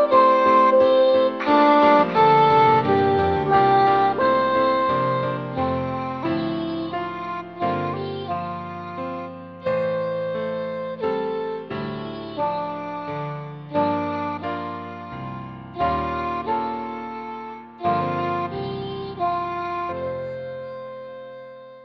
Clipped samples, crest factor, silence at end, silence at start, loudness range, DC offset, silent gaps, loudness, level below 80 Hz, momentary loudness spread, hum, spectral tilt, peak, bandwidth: under 0.1%; 18 dB; 0 s; 0 s; 11 LU; under 0.1%; none; -21 LUFS; -52 dBFS; 18 LU; none; -8 dB/octave; -4 dBFS; 6.2 kHz